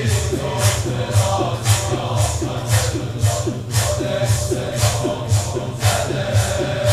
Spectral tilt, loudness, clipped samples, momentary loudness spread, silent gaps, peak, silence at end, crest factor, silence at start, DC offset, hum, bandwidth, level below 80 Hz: -4.5 dB/octave; -19 LUFS; under 0.1%; 3 LU; none; -4 dBFS; 0 s; 16 dB; 0 s; 0.1%; none; 16 kHz; -34 dBFS